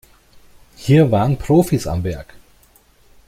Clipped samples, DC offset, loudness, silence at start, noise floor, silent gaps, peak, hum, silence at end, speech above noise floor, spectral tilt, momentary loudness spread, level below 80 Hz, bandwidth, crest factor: under 0.1%; under 0.1%; -17 LUFS; 0.8 s; -52 dBFS; none; -2 dBFS; none; 0.9 s; 37 dB; -7.5 dB/octave; 14 LU; -40 dBFS; 16 kHz; 16 dB